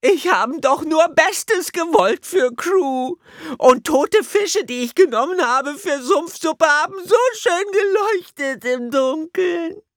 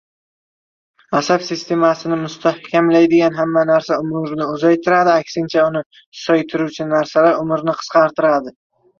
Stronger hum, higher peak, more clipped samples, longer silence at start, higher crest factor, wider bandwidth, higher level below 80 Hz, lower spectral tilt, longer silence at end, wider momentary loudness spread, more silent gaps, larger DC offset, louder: neither; about the same, 0 dBFS vs -2 dBFS; neither; second, 0.05 s vs 1.1 s; about the same, 18 dB vs 14 dB; first, 19 kHz vs 7.2 kHz; about the same, -62 dBFS vs -62 dBFS; second, -2.5 dB/octave vs -6 dB/octave; second, 0.15 s vs 0.5 s; about the same, 8 LU vs 8 LU; second, none vs 5.86-5.90 s, 6.06-6.12 s; neither; about the same, -18 LUFS vs -16 LUFS